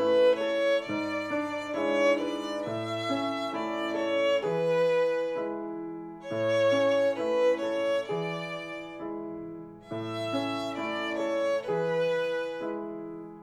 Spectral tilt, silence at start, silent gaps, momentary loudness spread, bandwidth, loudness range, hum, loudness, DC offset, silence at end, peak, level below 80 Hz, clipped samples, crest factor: -5.5 dB/octave; 0 s; none; 13 LU; 12 kHz; 5 LU; none; -29 LUFS; under 0.1%; 0 s; -14 dBFS; -68 dBFS; under 0.1%; 16 dB